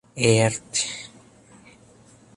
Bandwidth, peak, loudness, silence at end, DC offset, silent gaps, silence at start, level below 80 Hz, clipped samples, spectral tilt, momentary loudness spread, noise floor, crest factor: 11.5 kHz; -4 dBFS; -22 LUFS; 1.3 s; under 0.1%; none; 0.15 s; -58 dBFS; under 0.1%; -4 dB/octave; 18 LU; -52 dBFS; 22 dB